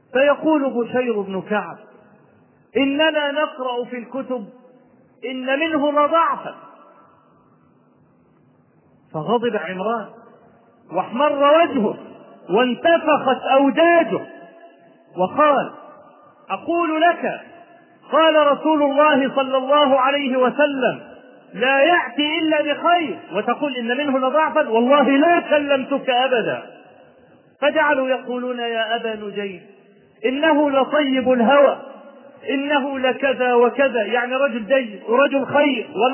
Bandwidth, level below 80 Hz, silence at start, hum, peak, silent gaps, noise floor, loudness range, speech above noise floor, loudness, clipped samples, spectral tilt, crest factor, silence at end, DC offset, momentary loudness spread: 3.2 kHz; -70 dBFS; 0.15 s; none; -2 dBFS; none; -56 dBFS; 6 LU; 38 dB; -18 LUFS; under 0.1%; -8.5 dB/octave; 18 dB; 0 s; under 0.1%; 13 LU